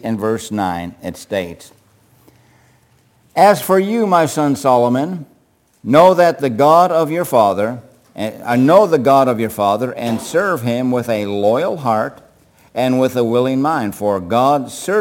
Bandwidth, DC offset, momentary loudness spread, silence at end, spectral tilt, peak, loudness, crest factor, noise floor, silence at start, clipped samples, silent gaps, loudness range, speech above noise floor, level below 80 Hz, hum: 17 kHz; under 0.1%; 13 LU; 0 s; -6 dB/octave; 0 dBFS; -15 LUFS; 16 dB; -56 dBFS; 0.05 s; under 0.1%; none; 5 LU; 42 dB; -58 dBFS; none